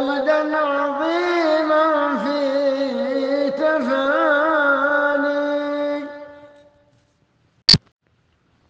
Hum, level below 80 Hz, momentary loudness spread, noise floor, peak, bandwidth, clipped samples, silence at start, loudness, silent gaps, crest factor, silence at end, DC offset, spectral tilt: none; -52 dBFS; 6 LU; -63 dBFS; 0 dBFS; 9.4 kHz; under 0.1%; 0 s; -19 LUFS; none; 20 dB; 0.9 s; under 0.1%; -4.5 dB/octave